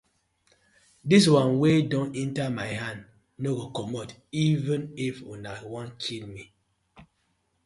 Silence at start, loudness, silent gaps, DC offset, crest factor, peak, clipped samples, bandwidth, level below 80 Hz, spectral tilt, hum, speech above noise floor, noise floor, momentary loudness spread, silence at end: 1.05 s; -26 LUFS; none; under 0.1%; 22 dB; -6 dBFS; under 0.1%; 11.5 kHz; -62 dBFS; -6 dB/octave; none; 47 dB; -73 dBFS; 18 LU; 0.6 s